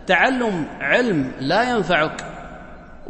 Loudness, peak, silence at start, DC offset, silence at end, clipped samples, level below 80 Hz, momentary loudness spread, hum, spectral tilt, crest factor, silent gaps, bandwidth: -19 LUFS; -2 dBFS; 0 s; under 0.1%; 0 s; under 0.1%; -44 dBFS; 19 LU; none; -5 dB/octave; 18 dB; none; 8.8 kHz